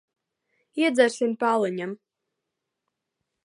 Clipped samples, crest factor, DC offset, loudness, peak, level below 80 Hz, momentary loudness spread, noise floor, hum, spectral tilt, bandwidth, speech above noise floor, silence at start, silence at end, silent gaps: under 0.1%; 22 dB; under 0.1%; -24 LUFS; -6 dBFS; -82 dBFS; 15 LU; -83 dBFS; none; -4.5 dB/octave; 11.5 kHz; 60 dB; 0.75 s; 1.5 s; none